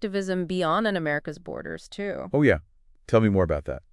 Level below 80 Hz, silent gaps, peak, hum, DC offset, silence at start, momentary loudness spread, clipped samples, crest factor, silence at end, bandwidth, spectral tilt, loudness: -46 dBFS; none; -6 dBFS; none; under 0.1%; 0 s; 14 LU; under 0.1%; 18 dB; 0.15 s; 11.5 kHz; -7 dB/octave; -25 LUFS